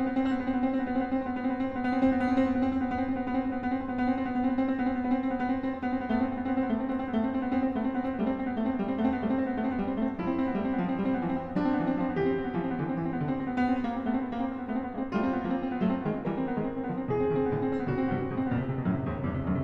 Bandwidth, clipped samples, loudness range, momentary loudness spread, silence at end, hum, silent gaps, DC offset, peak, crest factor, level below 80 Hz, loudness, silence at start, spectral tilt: 5.4 kHz; under 0.1%; 2 LU; 3 LU; 0 s; none; none; under 0.1%; -14 dBFS; 14 dB; -52 dBFS; -30 LUFS; 0 s; -9.5 dB/octave